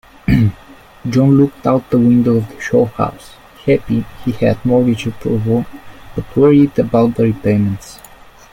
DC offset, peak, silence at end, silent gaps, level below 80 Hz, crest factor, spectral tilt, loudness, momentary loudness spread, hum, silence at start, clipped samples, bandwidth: under 0.1%; 0 dBFS; 0.55 s; none; -36 dBFS; 14 dB; -8.5 dB/octave; -14 LUFS; 11 LU; none; 0.3 s; under 0.1%; 16 kHz